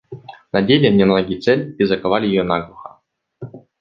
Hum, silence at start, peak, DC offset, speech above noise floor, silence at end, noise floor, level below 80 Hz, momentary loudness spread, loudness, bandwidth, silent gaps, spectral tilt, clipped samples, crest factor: none; 0.1 s; -2 dBFS; under 0.1%; 40 dB; 0.25 s; -56 dBFS; -50 dBFS; 23 LU; -16 LUFS; 7 kHz; none; -8 dB/octave; under 0.1%; 16 dB